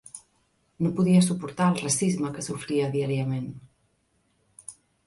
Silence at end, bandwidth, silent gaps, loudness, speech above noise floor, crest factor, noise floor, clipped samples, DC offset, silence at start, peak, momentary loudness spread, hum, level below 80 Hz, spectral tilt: 0.35 s; 11.5 kHz; none; -25 LUFS; 45 dB; 18 dB; -70 dBFS; under 0.1%; under 0.1%; 0.15 s; -10 dBFS; 24 LU; none; -64 dBFS; -5.5 dB/octave